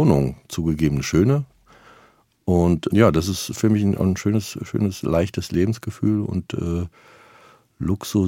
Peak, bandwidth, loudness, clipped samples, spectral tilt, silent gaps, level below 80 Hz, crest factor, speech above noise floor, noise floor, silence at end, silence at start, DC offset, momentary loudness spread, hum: -2 dBFS; 17 kHz; -21 LUFS; under 0.1%; -6.5 dB/octave; none; -44 dBFS; 20 dB; 36 dB; -56 dBFS; 0 s; 0 s; under 0.1%; 9 LU; none